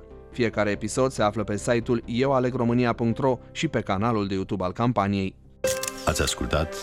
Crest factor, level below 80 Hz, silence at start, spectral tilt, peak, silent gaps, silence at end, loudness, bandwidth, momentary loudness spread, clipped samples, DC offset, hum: 16 dB; -44 dBFS; 0 s; -5 dB/octave; -8 dBFS; none; 0 s; -25 LUFS; 16 kHz; 5 LU; under 0.1%; under 0.1%; none